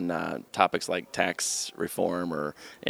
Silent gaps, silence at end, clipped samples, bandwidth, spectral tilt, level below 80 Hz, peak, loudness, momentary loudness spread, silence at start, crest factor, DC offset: none; 0 s; under 0.1%; over 20 kHz; -3 dB/octave; -68 dBFS; -4 dBFS; -29 LUFS; 7 LU; 0 s; 26 dB; under 0.1%